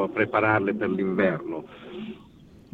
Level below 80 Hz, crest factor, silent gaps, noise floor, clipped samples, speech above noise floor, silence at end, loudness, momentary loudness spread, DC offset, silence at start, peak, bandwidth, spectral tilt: -62 dBFS; 18 dB; none; -51 dBFS; under 0.1%; 26 dB; 0.15 s; -24 LUFS; 18 LU; under 0.1%; 0 s; -8 dBFS; 5 kHz; -9 dB/octave